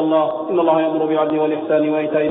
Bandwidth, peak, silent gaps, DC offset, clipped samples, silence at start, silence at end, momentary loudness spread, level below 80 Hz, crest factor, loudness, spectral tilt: 4 kHz; -4 dBFS; none; under 0.1%; under 0.1%; 0 s; 0 s; 2 LU; -70 dBFS; 12 dB; -18 LUFS; -10 dB/octave